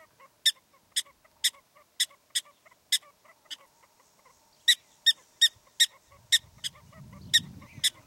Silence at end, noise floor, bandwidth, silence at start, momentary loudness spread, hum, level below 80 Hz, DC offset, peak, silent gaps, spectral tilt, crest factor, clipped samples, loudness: 0.2 s; -63 dBFS; 16.5 kHz; 0.45 s; 14 LU; none; -70 dBFS; under 0.1%; -8 dBFS; none; 2 dB/octave; 22 dB; under 0.1%; -27 LUFS